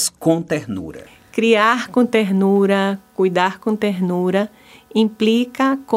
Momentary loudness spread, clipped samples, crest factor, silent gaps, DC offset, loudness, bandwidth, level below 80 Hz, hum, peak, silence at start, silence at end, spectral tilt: 9 LU; under 0.1%; 18 dB; none; under 0.1%; -18 LUFS; 16 kHz; -58 dBFS; none; 0 dBFS; 0 s; 0 s; -5 dB/octave